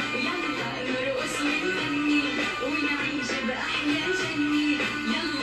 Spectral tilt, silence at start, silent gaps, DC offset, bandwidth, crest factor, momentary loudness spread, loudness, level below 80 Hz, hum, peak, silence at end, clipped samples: -3.5 dB/octave; 0 s; none; under 0.1%; 12.5 kHz; 14 dB; 4 LU; -26 LUFS; -56 dBFS; none; -14 dBFS; 0 s; under 0.1%